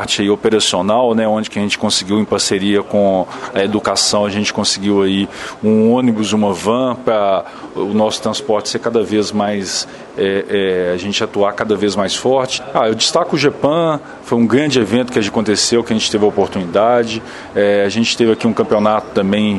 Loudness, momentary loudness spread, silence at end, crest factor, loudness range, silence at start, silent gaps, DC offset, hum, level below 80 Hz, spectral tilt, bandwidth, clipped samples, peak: -15 LUFS; 6 LU; 0 s; 14 dB; 2 LU; 0 s; none; under 0.1%; none; -50 dBFS; -4 dB/octave; 11.5 kHz; under 0.1%; 0 dBFS